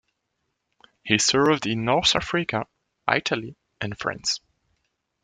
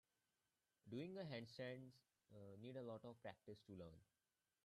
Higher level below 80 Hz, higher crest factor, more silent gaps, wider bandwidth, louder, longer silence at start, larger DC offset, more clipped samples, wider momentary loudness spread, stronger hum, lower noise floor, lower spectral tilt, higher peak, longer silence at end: first, -54 dBFS vs -88 dBFS; first, 24 dB vs 16 dB; neither; second, 10.5 kHz vs 12.5 kHz; first, -23 LUFS vs -57 LUFS; first, 1.05 s vs 0.85 s; neither; neither; first, 14 LU vs 10 LU; neither; second, -77 dBFS vs under -90 dBFS; second, -3 dB/octave vs -7 dB/octave; first, -2 dBFS vs -42 dBFS; first, 0.85 s vs 0.6 s